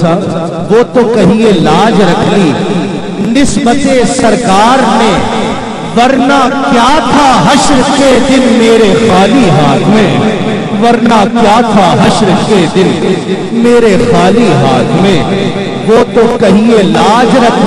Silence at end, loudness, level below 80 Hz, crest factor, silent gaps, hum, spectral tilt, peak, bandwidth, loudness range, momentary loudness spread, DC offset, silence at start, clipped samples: 0 s; -7 LUFS; -30 dBFS; 6 dB; none; none; -5.5 dB/octave; 0 dBFS; 12 kHz; 2 LU; 6 LU; 2%; 0 s; 0.3%